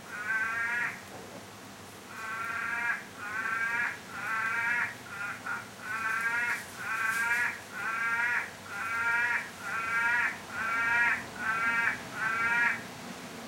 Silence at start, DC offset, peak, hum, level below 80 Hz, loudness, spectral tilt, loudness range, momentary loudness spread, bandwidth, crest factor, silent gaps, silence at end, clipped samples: 0 s; under 0.1%; -14 dBFS; none; -72 dBFS; -30 LUFS; -2 dB/octave; 5 LU; 14 LU; 16.5 kHz; 18 dB; none; 0 s; under 0.1%